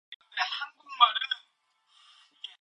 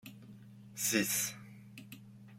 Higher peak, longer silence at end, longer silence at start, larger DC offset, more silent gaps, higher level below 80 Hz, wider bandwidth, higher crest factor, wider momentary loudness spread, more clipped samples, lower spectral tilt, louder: first, -6 dBFS vs -18 dBFS; first, 0.15 s vs 0 s; about the same, 0.1 s vs 0.05 s; neither; first, 0.16-0.20 s vs none; second, under -90 dBFS vs -76 dBFS; second, 9 kHz vs 16.5 kHz; about the same, 26 dB vs 22 dB; second, 19 LU vs 24 LU; neither; second, 3 dB/octave vs -2 dB/octave; first, -28 LUFS vs -33 LUFS